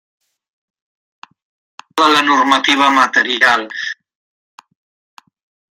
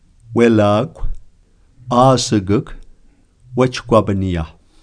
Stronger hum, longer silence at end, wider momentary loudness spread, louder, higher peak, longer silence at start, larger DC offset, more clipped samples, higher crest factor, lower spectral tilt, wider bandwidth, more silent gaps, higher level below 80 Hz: neither; first, 1.85 s vs 0.35 s; second, 13 LU vs 17 LU; first, -12 LUFS vs -16 LUFS; about the same, 0 dBFS vs 0 dBFS; first, 1.95 s vs 0.3 s; neither; neither; about the same, 18 dB vs 16 dB; second, -1.5 dB/octave vs -6 dB/octave; first, 16 kHz vs 10.5 kHz; neither; second, -70 dBFS vs -32 dBFS